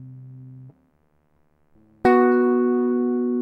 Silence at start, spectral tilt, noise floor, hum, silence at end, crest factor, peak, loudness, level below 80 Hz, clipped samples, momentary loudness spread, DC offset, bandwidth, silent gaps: 0 s; -8.5 dB/octave; -63 dBFS; none; 0 s; 18 dB; -4 dBFS; -19 LUFS; -58 dBFS; under 0.1%; 25 LU; under 0.1%; 5.2 kHz; none